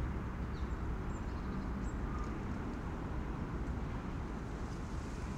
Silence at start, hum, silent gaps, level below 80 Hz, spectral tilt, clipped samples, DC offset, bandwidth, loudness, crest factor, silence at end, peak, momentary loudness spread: 0 s; none; none; -42 dBFS; -7.5 dB/octave; under 0.1%; under 0.1%; 9.8 kHz; -42 LUFS; 12 dB; 0 s; -28 dBFS; 2 LU